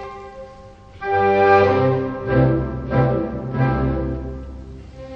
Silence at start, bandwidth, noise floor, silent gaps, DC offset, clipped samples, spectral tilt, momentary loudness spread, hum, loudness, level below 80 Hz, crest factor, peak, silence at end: 0 s; 6.2 kHz; -41 dBFS; none; under 0.1%; under 0.1%; -9 dB/octave; 23 LU; none; -19 LUFS; -34 dBFS; 16 dB; -2 dBFS; 0 s